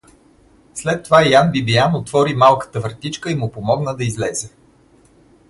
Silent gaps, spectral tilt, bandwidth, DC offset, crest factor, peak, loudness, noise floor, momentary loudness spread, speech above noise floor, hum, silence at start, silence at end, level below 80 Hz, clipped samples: none; -5 dB/octave; 11.5 kHz; under 0.1%; 18 dB; 0 dBFS; -17 LUFS; -51 dBFS; 13 LU; 35 dB; none; 0.75 s; 1 s; -50 dBFS; under 0.1%